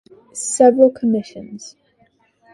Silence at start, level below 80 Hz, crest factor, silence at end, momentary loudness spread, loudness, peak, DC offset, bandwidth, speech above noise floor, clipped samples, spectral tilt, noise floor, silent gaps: 0.35 s; -64 dBFS; 18 dB; 0.85 s; 23 LU; -15 LUFS; 0 dBFS; under 0.1%; 11.5 kHz; 43 dB; under 0.1%; -5 dB/octave; -59 dBFS; none